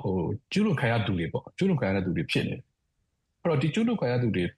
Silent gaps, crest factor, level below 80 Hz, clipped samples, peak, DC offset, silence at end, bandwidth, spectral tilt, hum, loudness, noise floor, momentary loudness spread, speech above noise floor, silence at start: none; 14 dB; -56 dBFS; under 0.1%; -14 dBFS; under 0.1%; 0.05 s; 12 kHz; -7 dB/octave; none; -27 LUFS; -76 dBFS; 6 LU; 50 dB; 0 s